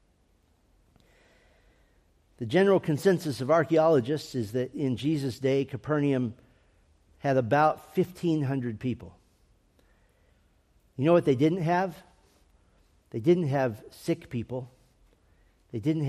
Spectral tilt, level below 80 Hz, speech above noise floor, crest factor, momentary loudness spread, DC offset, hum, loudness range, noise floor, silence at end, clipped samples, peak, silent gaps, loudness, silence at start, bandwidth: -7.5 dB/octave; -64 dBFS; 40 dB; 18 dB; 12 LU; under 0.1%; none; 5 LU; -66 dBFS; 0 s; under 0.1%; -10 dBFS; none; -27 LUFS; 2.4 s; 14.5 kHz